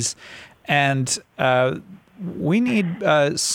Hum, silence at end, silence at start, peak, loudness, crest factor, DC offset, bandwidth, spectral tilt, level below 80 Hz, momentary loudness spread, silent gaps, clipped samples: none; 0 s; 0 s; -4 dBFS; -20 LUFS; 16 dB; under 0.1%; 17 kHz; -4 dB/octave; -60 dBFS; 17 LU; none; under 0.1%